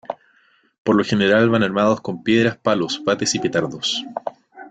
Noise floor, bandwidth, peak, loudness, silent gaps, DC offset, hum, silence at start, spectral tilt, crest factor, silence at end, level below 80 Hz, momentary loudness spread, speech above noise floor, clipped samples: -58 dBFS; 9.4 kHz; -4 dBFS; -19 LUFS; 0.78-0.85 s; under 0.1%; none; 0.1 s; -4.5 dB/octave; 16 dB; 0 s; -56 dBFS; 15 LU; 40 dB; under 0.1%